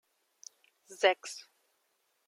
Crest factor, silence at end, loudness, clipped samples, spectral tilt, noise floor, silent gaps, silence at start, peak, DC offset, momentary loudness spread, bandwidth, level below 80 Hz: 26 dB; 0.85 s; -30 LUFS; under 0.1%; 0 dB/octave; -77 dBFS; none; 0.9 s; -12 dBFS; under 0.1%; 24 LU; 14.5 kHz; under -90 dBFS